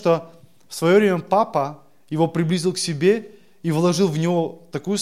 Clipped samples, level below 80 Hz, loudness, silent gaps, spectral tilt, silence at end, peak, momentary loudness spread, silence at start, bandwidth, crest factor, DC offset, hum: under 0.1%; -68 dBFS; -21 LUFS; none; -5.5 dB/octave; 0 s; -4 dBFS; 12 LU; 0 s; 15 kHz; 16 dB; 0.3%; none